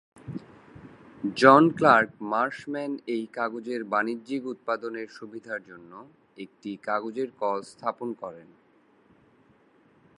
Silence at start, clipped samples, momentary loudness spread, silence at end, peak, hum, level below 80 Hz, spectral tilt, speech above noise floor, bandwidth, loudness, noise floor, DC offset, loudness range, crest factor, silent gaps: 0.25 s; under 0.1%; 22 LU; 1.75 s; 0 dBFS; none; -70 dBFS; -6 dB/octave; 35 dB; 11 kHz; -26 LUFS; -61 dBFS; under 0.1%; 11 LU; 26 dB; none